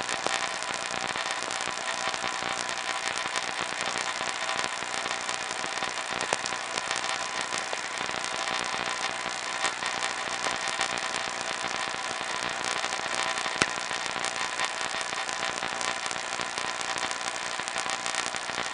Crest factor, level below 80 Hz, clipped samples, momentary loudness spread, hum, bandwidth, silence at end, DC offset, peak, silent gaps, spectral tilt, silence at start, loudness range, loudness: 28 dB; -64 dBFS; under 0.1%; 2 LU; none; 11.5 kHz; 0 s; under 0.1%; -4 dBFS; none; -0.5 dB/octave; 0 s; 1 LU; -29 LUFS